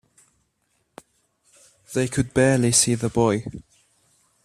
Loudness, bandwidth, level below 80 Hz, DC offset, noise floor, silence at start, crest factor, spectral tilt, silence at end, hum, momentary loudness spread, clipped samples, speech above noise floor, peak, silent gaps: -20 LUFS; 15 kHz; -52 dBFS; under 0.1%; -70 dBFS; 1.9 s; 22 dB; -4.5 dB/octave; 0.85 s; none; 13 LU; under 0.1%; 50 dB; -2 dBFS; none